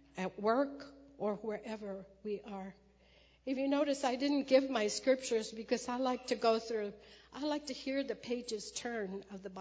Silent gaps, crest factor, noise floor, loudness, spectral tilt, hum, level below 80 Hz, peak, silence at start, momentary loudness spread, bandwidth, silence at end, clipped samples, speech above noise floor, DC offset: none; 22 dB; -66 dBFS; -36 LUFS; -4 dB/octave; none; -70 dBFS; -16 dBFS; 0.15 s; 14 LU; 8 kHz; 0 s; under 0.1%; 30 dB; under 0.1%